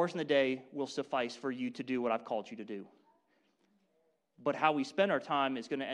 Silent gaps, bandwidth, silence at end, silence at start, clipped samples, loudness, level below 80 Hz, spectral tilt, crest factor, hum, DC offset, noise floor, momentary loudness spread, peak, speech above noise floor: none; 10.5 kHz; 0 s; 0 s; under 0.1%; -34 LUFS; -82 dBFS; -5 dB/octave; 22 dB; none; under 0.1%; -76 dBFS; 9 LU; -12 dBFS; 42 dB